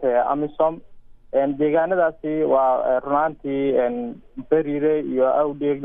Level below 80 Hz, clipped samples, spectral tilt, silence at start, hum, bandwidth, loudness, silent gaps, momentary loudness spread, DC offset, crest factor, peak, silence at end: -52 dBFS; under 0.1%; -11 dB/octave; 0 s; none; 3.8 kHz; -21 LUFS; none; 6 LU; under 0.1%; 14 dB; -6 dBFS; 0 s